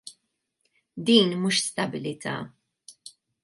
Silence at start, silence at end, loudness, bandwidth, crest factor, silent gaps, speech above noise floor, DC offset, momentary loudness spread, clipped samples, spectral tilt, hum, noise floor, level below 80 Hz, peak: 0.05 s; 0.35 s; -24 LUFS; 11.5 kHz; 24 dB; none; 53 dB; under 0.1%; 26 LU; under 0.1%; -4 dB/octave; none; -77 dBFS; -72 dBFS; -4 dBFS